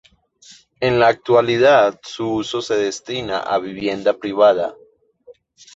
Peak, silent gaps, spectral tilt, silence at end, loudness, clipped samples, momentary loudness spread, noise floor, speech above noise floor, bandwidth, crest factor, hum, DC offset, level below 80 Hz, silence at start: -2 dBFS; none; -5 dB/octave; 0.45 s; -18 LUFS; under 0.1%; 10 LU; -49 dBFS; 32 dB; 8 kHz; 18 dB; none; under 0.1%; -54 dBFS; 0.8 s